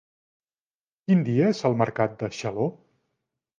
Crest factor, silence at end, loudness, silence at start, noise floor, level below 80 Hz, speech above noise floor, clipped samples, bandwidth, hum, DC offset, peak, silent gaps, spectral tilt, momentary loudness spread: 20 dB; 0.85 s; -25 LUFS; 1.1 s; under -90 dBFS; -64 dBFS; over 67 dB; under 0.1%; 7.4 kHz; none; under 0.1%; -8 dBFS; none; -7.5 dB/octave; 8 LU